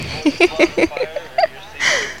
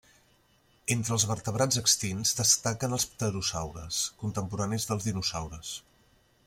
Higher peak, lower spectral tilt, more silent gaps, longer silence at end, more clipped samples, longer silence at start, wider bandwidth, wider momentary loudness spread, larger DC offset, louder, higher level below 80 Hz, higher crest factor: first, 0 dBFS vs -10 dBFS; about the same, -3 dB/octave vs -3 dB/octave; neither; second, 0 s vs 0.65 s; neither; second, 0 s vs 0.85 s; about the same, 15.5 kHz vs 16.5 kHz; second, 7 LU vs 13 LU; first, 0.8% vs under 0.1%; first, -17 LUFS vs -28 LUFS; first, -44 dBFS vs -56 dBFS; about the same, 18 dB vs 22 dB